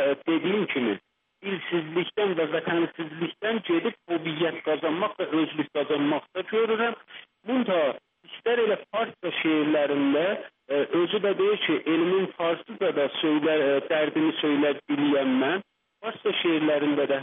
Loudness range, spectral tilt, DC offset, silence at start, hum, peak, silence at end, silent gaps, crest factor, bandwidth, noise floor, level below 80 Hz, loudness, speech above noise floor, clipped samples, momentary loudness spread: 3 LU; -3 dB/octave; under 0.1%; 0 s; none; -12 dBFS; 0 s; none; 14 dB; 3.9 kHz; -47 dBFS; -80 dBFS; -26 LUFS; 22 dB; under 0.1%; 7 LU